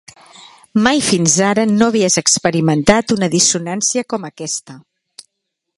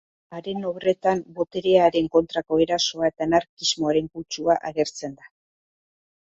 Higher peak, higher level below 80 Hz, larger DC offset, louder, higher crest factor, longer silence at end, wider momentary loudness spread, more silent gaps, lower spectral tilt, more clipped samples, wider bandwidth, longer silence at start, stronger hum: first, 0 dBFS vs -4 dBFS; first, -46 dBFS vs -58 dBFS; neither; first, -14 LUFS vs -23 LUFS; about the same, 16 dB vs 20 dB; second, 1 s vs 1.25 s; about the same, 11 LU vs 13 LU; second, none vs 3.49-3.57 s; about the same, -3.5 dB/octave vs -4 dB/octave; neither; first, 11.5 kHz vs 8 kHz; first, 0.75 s vs 0.3 s; neither